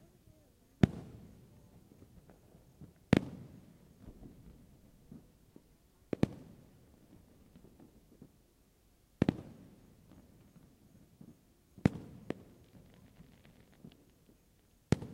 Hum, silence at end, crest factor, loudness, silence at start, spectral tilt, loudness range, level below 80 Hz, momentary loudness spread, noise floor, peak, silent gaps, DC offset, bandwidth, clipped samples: none; 0 s; 34 dB; -36 LUFS; 0.8 s; -7.5 dB/octave; 7 LU; -58 dBFS; 29 LU; -68 dBFS; -8 dBFS; none; under 0.1%; 16 kHz; under 0.1%